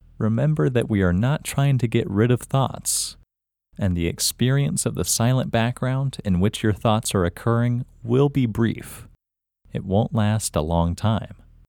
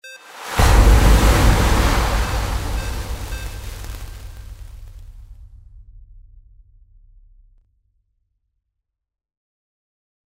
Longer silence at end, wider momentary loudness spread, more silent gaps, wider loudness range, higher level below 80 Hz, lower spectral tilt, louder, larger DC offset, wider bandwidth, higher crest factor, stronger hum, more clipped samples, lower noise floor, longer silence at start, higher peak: second, 0.35 s vs 4.7 s; second, 5 LU vs 25 LU; neither; second, 2 LU vs 24 LU; second, -42 dBFS vs -22 dBFS; about the same, -5.5 dB/octave vs -5 dB/octave; second, -22 LUFS vs -18 LUFS; neither; first, 18.5 kHz vs 16 kHz; about the same, 18 dB vs 20 dB; neither; neither; first, -85 dBFS vs -78 dBFS; first, 0.2 s vs 0.05 s; second, -4 dBFS vs 0 dBFS